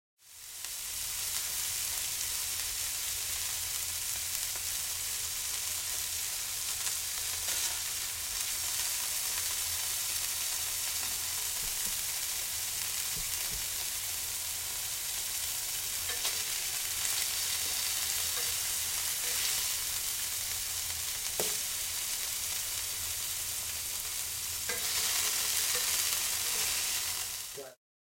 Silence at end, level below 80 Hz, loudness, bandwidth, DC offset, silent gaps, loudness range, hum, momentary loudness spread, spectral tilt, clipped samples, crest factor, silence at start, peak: 0.35 s; -58 dBFS; -31 LUFS; 16.5 kHz; under 0.1%; none; 3 LU; none; 4 LU; 1.5 dB/octave; under 0.1%; 26 dB; 0.25 s; -8 dBFS